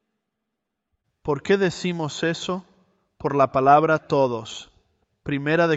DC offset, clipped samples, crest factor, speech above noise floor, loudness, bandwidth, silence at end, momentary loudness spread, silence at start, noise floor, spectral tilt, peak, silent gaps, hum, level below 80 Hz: under 0.1%; under 0.1%; 20 dB; 60 dB; -22 LUFS; 8.2 kHz; 0 s; 16 LU; 1.25 s; -81 dBFS; -5.5 dB/octave; -4 dBFS; none; none; -58 dBFS